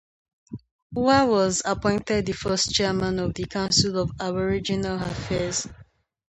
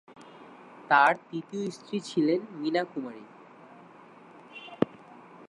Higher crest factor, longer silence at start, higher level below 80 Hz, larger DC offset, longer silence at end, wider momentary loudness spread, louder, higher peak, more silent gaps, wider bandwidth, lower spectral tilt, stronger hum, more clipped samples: about the same, 20 dB vs 24 dB; first, 0.5 s vs 0.1 s; first, -46 dBFS vs -76 dBFS; neither; first, 0.45 s vs 0.05 s; second, 12 LU vs 28 LU; first, -24 LUFS vs -28 LUFS; about the same, -6 dBFS vs -8 dBFS; first, 0.71-0.90 s vs none; second, 9 kHz vs 11.5 kHz; second, -4 dB/octave vs -5.5 dB/octave; neither; neither